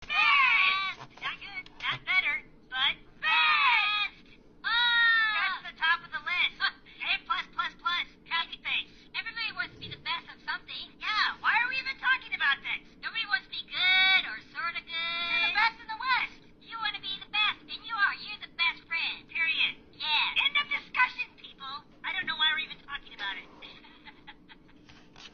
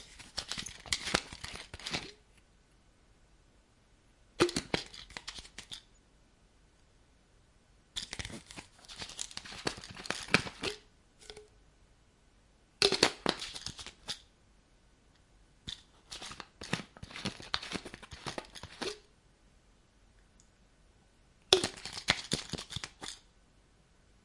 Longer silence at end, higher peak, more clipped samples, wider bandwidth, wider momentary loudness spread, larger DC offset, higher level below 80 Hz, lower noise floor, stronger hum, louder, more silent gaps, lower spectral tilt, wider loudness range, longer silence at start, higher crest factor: second, 0.05 s vs 1.05 s; second, -12 dBFS vs -2 dBFS; neither; second, 6.8 kHz vs 11.5 kHz; second, 15 LU vs 19 LU; neither; about the same, -62 dBFS vs -60 dBFS; second, -55 dBFS vs -65 dBFS; neither; first, -28 LUFS vs -36 LUFS; neither; second, 3.5 dB/octave vs -2.5 dB/octave; second, 7 LU vs 12 LU; about the same, 0 s vs 0 s; second, 18 dB vs 38 dB